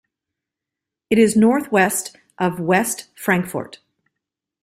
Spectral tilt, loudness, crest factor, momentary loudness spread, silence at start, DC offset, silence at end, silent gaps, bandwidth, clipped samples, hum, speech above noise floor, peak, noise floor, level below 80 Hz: -5 dB/octave; -18 LUFS; 18 dB; 13 LU; 1.1 s; under 0.1%; 0.9 s; none; 16 kHz; under 0.1%; none; 67 dB; -2 dBFS; -85 dBFS; -58 dBFS